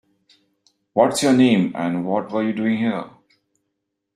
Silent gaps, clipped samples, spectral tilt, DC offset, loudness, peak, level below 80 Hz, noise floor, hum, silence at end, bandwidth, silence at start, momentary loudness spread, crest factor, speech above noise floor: none; under 0.1%; -5.5 dB/octave; under 0.1%; -19 LUFS; -2 dBFS; -64 dBFS; -77 dBFS; none; 1.05 s; 14 kHz; 0.95 s; 10 LU; 20 dB; 59 dB